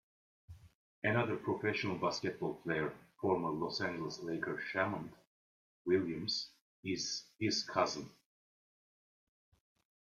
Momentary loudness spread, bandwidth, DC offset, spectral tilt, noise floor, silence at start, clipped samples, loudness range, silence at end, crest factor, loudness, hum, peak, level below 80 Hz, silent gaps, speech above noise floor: 8 LU; 13 kHz; under 0.1%; -4.5 dB/octave; under -90 dBFS; 0.5 s; under 0.1%; 3 LU; 2.05 s; 20 dB; -37 LUFS; none; -18 dBFS; -72 dBFS; 0.75-1.02 s, 5.27-5.85 s, 6.61-6.83 s; over 53 dB